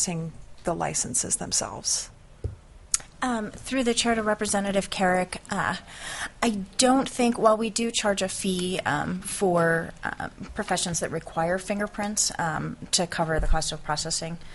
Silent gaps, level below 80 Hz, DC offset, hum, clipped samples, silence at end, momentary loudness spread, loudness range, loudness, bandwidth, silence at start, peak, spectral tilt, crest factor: none; -40 dBFS; under 0.1%; none; under 0.1%; 0 s; 11 LU; 3 LU; -26 LUFS; 11.5 kHz; 0 s; -2 dBFS; -3 dB/octave; 24 dB